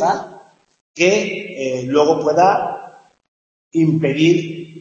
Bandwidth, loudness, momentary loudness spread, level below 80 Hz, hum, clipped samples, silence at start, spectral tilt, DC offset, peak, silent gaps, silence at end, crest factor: 7.6 kHz; -17 LUFS; 12 LU; -64 dBFS; none; under 0.1%; 0 s; -5.5 dB/octave; under 0.1%; -2 dBFS; 0.81-0.94 s, 3.28-3.71 s; 0 s; 16 dB